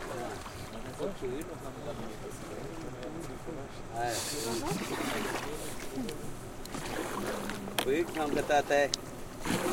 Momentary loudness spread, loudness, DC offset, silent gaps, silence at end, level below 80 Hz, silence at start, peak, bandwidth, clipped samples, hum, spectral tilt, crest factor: 13 LU; -35 LUFS; under 0.1%; none; 0 s; -50 dBFS; 0 s; -6 dBFS; 16.5 kHz; under 0.1%; none; -4 dB/octave; 30 dB